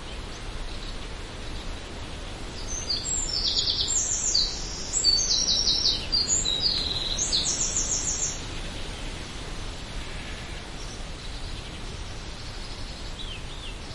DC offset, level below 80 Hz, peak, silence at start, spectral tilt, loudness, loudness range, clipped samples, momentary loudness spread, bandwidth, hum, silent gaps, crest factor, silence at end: 0.1%; -38 dBFS; -10 dBFS; 0 s; -1 dB/octave; -25 LUFS; 15 LU; under 0.1%; 17 LU; 11.5 kHz; none; none; 20 dB; 0 s